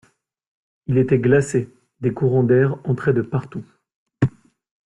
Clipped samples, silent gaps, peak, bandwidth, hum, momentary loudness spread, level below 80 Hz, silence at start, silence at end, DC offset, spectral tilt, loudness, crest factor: under 0.1%; 3.94-4.06 s; -4 dBFS; 11 kHz; none; 15 LU; -54 dBFS; 0.9 s; 0.55 s; under 0.1%; -8.5 dB/octave; -20 LUFS; 16 dB